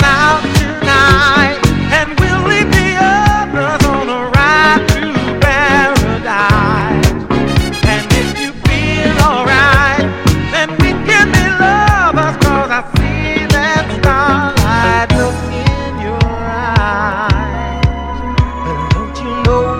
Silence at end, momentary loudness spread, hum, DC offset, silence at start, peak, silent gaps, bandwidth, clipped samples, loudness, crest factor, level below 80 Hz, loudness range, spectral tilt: 0 s; 7 LU; none; under 0.1%; 0 s; 0 dBFS; none; 17 kHz; 0.2%; -11 LUFS; 12 dB; -22 dBFS; 5 LU; -5 dB/octave